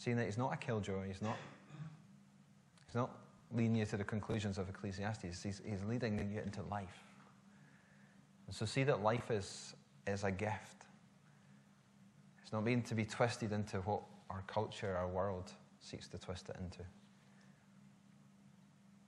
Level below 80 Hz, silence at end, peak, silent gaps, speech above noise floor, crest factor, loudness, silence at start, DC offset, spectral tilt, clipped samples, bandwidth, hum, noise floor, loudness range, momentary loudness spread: -70 dBFS; 0.05 s; -20 dBFS; none; 26 dB; 24 dB; -41 LUFS; 0 s; under 0.1%; -6 dB/octave; under 0.1%; 11.5 kHz; none; -66 dBFS; 5 LU; 18 LU